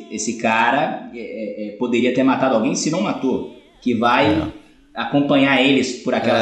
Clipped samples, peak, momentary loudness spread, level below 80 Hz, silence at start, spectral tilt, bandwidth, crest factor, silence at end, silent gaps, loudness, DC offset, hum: under 0.1%; -4 dBFS; 14 LU; -52 dBFS; 0 s; -4.5 dB/octave; 9.2 kHz; 16 dB; 0 s; none; -18 LUFS; under 0.1%; none